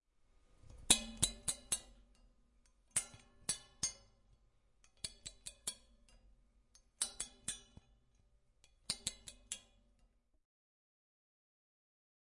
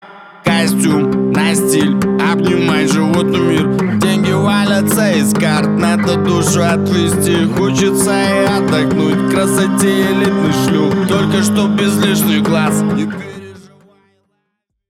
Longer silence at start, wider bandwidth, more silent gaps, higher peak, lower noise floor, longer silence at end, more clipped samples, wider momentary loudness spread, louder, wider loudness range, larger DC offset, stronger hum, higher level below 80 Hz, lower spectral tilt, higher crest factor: first, 0.65 s vs 0.05 s; second, 11.5 kHz vs 16 kHz; neither; second, -10 dBFS vs -2 dBFS; first, -74 dBFS vs -70 dBFS; first, 2.8 s vs 1.3 s; neither; first, 19 LU vs 2 LU; second, -39 LUFS vs -13 LUFS; first, 11 LU vs 1 LU; neither; neither; second, -64 dBFS vs -46 dBFS; second, -0.5 dB/octave vs -5 dB/octave; first, 36 dB vs 12 dB